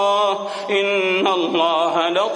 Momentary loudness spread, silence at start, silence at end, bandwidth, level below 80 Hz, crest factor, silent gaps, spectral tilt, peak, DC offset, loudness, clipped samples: 3 LU; 0 s; 0 s; 10.5 kHz; -70 dBFS; 14 dB; none; -3.5 dB/octave; -4 dBFS; under 0.1%; -18 LUFS; under 0.1%